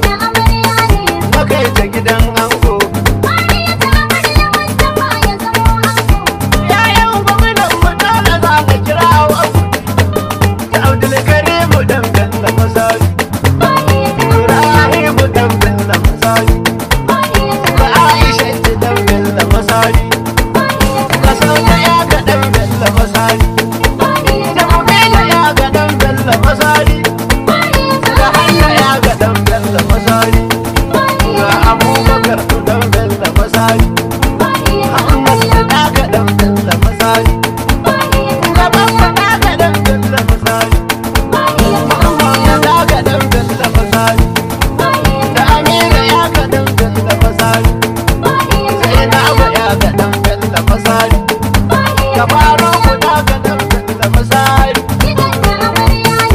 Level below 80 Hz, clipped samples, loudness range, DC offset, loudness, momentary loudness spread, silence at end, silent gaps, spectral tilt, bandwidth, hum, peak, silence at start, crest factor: -18 dBFS; 1%; 1 LU; under 0.1%; -10 LUFS; 5 LU; 0 s; none; -5 dB/octave; 16.5 kHz; none; 0 dBFS; 0 s; 10 dB